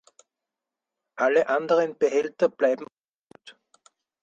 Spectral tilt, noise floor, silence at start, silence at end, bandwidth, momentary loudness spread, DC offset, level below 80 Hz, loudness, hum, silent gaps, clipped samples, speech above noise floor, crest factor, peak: -4.5 dB/octave; -88 dBFS; 1.15 s; 0.7 s; 7.8 kHz; 10 LU; under 0.1%; -76 dBFS; -24 LUFS; none; 2.93-2.97 s, 3.08-3.12 s, 3.21-3.27 s; under 0.1%; 65 dB; 18 dB; -8 dBFS